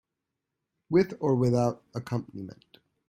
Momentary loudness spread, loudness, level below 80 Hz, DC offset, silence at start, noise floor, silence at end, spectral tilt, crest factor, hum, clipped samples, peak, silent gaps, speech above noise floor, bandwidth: 17 LU; -27 LUFS; -62 dBFS; under 0.1%; 0.9 s; -85 dBFS; 0.6 s; -8 dB/octave; 18 dB; none; under 0.1%; -10 dBFS; none; 58 dB; 14.5 kHz